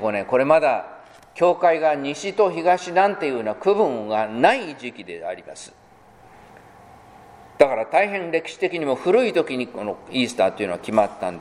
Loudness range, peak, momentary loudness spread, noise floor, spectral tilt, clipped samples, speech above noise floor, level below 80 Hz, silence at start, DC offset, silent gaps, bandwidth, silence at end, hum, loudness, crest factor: 6 LU; 0 dBFS; 15 LU; -50 dBFS; -5 dB/octave; under 0.1%; 29 dB; -62 dBFS; 0 s; under 0.1%; none; 11.5 kHz; 0 s; none; -21 LUFS; 22 dB